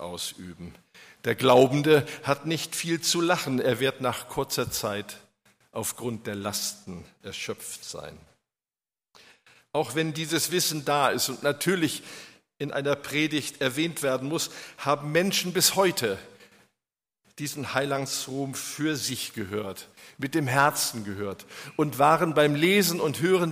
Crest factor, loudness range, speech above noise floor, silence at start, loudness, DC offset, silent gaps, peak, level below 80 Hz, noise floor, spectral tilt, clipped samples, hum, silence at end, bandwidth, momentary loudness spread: 20 dB; 10 LU; over 64 dB; 0 s; -26 LUFS; under 0.1%; none; -6 dBFS; -64 dBFS; under -90 dBFS; -3.5 dB/octave; under 0.1%; none; 0 s; 15.5 kHz; 16 LU